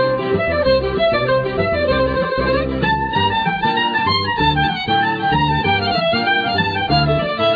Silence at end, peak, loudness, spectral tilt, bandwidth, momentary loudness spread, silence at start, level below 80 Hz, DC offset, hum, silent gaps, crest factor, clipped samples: 0 s; -4 dBFS; -17 LUFS; -7.5 dB/octave; 5 kHz; 2 LU; 0 s; -34 dBFS; under 0.1%; none; none; 12 dB; under 0.1%